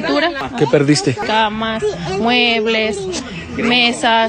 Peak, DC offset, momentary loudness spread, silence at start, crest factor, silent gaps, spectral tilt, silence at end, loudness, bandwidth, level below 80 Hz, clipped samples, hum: 0 dBFS; under 0.1%; 8 LU; 0 s; 16 dB; none; -4 dB/octave; 0 s; -15 LUFS; 11 kHz; -44 dBFS; under 0.1%; none